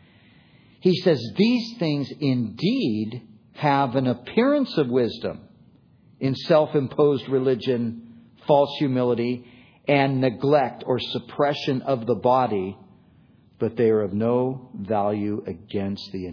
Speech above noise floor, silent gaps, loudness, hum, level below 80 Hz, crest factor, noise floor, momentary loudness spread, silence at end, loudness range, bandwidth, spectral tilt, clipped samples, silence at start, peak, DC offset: 33 dB; none; -23 LUFS; none; -64 dBFS; 18 dB; -55 dBFS; 10 LU; 0 s; 2 LU; 5.4 kHz; -8 dB/octave; under 0.1%; 0.85 s; -6 dBFS; under 0.1%